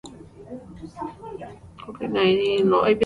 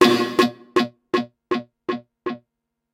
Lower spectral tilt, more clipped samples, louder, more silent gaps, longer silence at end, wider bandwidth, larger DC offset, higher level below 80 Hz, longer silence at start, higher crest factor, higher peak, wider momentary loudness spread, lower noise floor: first, -6.5 dB/octave vs -4.5 dB/octave; neither; about the same, -21 LUFS vs -23 LUFS; neither; second, 0 s vs 0.55 s; second, 10.5 kHz vs 16 kHz; neither; first, -54 dBFS vs -68 dBFS; about the same, 0.05 s vs 0 s; second, 16 dB vs 22 dB; second, -8 dBFS vs 0 dBFS; first, 22 LU vs 13 LU; second, -42 dBFS vs -79 dBFS